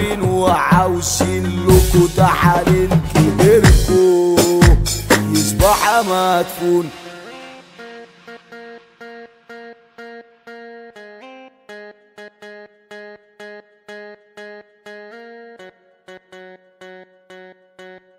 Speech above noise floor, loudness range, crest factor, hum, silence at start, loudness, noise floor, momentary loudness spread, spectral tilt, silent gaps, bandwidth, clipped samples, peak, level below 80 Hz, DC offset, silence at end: 29 dB; 25 LU; 16 dB; none; 0 s; -14 LUFS; -43 dBFS; 26 LU; -5.5 dB/octave; none; 16.5 kHz; under 0.1%; 0 dBFS; -26 dBFS; under 0.1%; 0.25 s